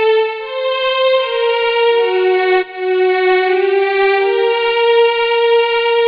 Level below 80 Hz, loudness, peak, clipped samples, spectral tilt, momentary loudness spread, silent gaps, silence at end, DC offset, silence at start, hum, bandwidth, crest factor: -60 dBFS; -13 LUFS; -2 dBFS; under 0.1%; -4 dB/octave; 4 LU; none; 0 s; under 0.1%; 0 s; none; 5.2 kHz; 12 dB